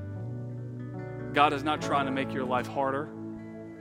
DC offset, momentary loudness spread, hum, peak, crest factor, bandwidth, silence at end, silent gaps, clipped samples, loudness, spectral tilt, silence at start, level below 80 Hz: under 0.1%; 15 LU; none; -8 dBFS; 24 dB; 15.5 kHz; 0 s; none; under 0.1%; -30 LUFS; -6 dB/octave; 0 s; -60 dBFS